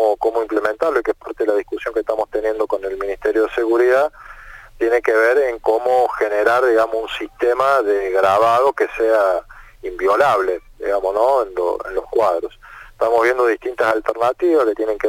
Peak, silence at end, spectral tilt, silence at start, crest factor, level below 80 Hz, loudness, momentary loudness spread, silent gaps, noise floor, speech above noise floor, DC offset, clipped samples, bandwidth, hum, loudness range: -2 dBFS; 0 s; -4.5 dB/octave; 0 s; 14 dB; -46 dBFS; -18 LUFS; 8 LU; none; -39 dBFS; 21 dB; under 0.1%; under 0.1%; 16.5 kHz; none; 3 LU